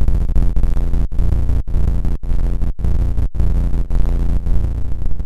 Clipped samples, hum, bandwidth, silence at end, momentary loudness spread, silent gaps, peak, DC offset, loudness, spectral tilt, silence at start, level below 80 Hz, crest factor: under 0.1%; none; 3.4 kHz; 0 s; 3 LU; none; -2 dBFS; under 0.1%; -21 LUFS; -9 dB/octave; 0 s; -16 dBFS; 10 dB